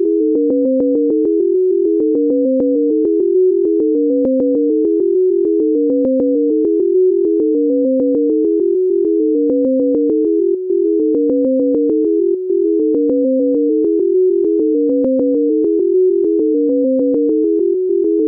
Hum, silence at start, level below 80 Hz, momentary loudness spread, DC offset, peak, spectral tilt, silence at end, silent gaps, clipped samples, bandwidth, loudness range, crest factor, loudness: none; 0 s; -60 dBFS; 1 LU; under 0.1%; -8 dBFS; -13.5 dB/octave; 0 s; none; under 0.1%; 1.3 kHz; 1 LU; 6 dB; -14 LUFS